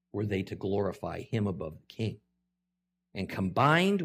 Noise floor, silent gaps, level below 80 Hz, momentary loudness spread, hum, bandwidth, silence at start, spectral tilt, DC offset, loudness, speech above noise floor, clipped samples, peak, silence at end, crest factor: -85 dBFS; none; -66 dBFS; 15 LU; none; 15.5 kHz; 0.15 s; -6.5 dB/octave; under 0.1%; -31 LUFS; 55 dB; under 0.1%; -10 dBFS; 0 s; 20 dB